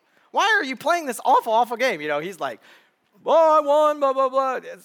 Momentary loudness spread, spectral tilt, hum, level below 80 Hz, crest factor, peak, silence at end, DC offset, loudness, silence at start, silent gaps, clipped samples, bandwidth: 11 LU; -2.5 dB/octave; none; -84 dBFS; 14 dB; -8 dBFS; 0.1 s; under 0.1%; -20 LUFS; 0.35 s; none; under 0.1%; 19.5 kHz